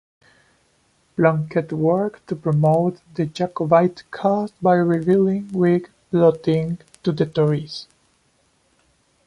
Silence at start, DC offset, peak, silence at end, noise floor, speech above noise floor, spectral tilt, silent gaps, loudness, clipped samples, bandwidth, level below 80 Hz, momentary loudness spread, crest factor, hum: 1.2 s; under 0.1%; -2 dBFS; 1.45 s; -63 dBFS; 44 dB; -8.5 dB/octave; none; -20 LUFS; under 0.1%; 11 kHz; -58 dBFS; 9 LU; 18 dB; none